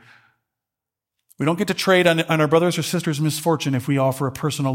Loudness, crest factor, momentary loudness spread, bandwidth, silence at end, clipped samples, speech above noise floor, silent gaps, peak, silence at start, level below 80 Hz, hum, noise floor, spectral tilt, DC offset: -20 LUFS; 18 dB; 7 LU; 17 kHz; 0 s; under 0.1%; 67 dB; none; -2 dBFS; 1.4 s; -62 dBFS; none; -87 dBFS; -5 dB/octave; under 0.1%